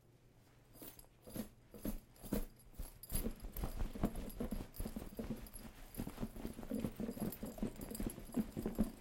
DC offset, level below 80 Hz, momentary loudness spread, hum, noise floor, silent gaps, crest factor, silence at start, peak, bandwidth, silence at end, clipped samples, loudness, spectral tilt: under 0.1%; -50 dBFS; 12 LU; none; -66 dBFS; none; 24 dB; 0.05 s; -20 dBFS; 16.5 kHz; 0 s; under 0.1%; -46 LUFS; -6 dB/octave